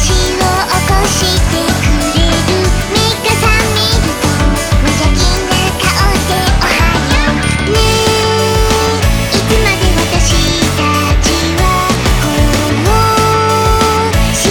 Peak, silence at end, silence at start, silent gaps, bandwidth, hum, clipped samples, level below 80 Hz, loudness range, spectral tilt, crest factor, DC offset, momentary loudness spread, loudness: 0 dBFS; 0 s; 0 s; none; over 20 kHz; none; under 0.1%; -16 dBFS; 1 LU; -4 dB/octave; 10 dB; under 0.1%; 2 LU; -11 LUFS